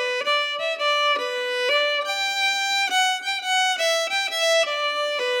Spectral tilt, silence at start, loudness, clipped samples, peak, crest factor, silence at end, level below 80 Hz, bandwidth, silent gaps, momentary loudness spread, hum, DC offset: 3 dB/octave; 0 s; -21 LUFS; under 0.1%; -8 dBFS; 14 dB; 0 s; under -90 dBFS; 17.5 kHz; none; 4 LU; none; under 0.1%